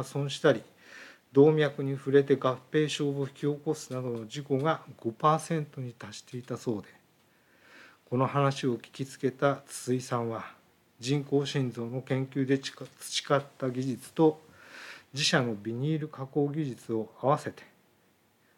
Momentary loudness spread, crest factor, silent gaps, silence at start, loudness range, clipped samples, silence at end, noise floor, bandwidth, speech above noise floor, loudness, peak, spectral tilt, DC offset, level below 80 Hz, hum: 15 LU; 20 dB; none; 0 s; 6 LU; under 0.1%; 0.95 s; -67 dBFS; 16 kHz; 37 dB; -30 LUFS; -10 dBFS; -5.5 dB/octave; under 0.1%; -82 dBFS; none